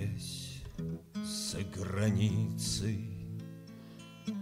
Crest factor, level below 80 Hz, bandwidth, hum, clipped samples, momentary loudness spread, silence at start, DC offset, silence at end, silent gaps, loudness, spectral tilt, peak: 18 dB; -56 dBFS; 15.5 kHz; none; under 0.1%; 17 LU; 0 s; under 0.1%; 0 s; none; -36 LUFS; -5 dB/octave; -18 dBFS